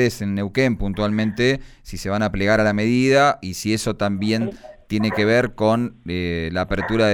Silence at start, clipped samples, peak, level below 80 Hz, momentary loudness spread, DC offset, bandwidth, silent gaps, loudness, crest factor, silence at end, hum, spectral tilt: 0 s; under 0.1%; -6 dBFS; -40 dBFS; 9 LU; under 0.1%; 17.5 kHz; none; -20 LUFS; 14 dB; 0 s; none; -5.5 dB/octave